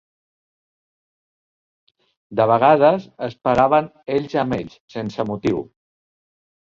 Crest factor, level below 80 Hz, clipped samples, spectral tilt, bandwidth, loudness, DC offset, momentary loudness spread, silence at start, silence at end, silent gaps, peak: 20 dB; -54 dBFS; under 0.1%; -7.5 dB/octave; 7.4 kHz; -19 LUFS; under 0.1%; 14 LU; 2.3 s; 1.1 s; 4.80-4.88 s; -2 dBFS